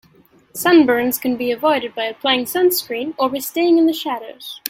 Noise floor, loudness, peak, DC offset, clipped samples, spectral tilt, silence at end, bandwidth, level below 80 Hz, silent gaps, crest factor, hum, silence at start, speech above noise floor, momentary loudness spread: -52 dBFS; -17 LUFS; 0 dBFS; under 0.1%; under 0.1%; -3 dB/octave; 0 s; 17 kHz; -60 dBFS; none; 18 dB; none; 0.55 s; 35 dB; 12 LU